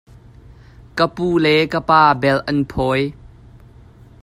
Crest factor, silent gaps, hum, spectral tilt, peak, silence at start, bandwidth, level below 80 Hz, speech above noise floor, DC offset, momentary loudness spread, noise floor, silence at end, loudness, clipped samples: 18 dB; none; none; -6.5 dB/octave; 0 dBFS; 0.95 s; 15.5 kHz; -44 dBFS; 28 dB; under 0.1%; 8 LU; -44 dBFS; 0.95 s; -16 LUFS; under 0.1%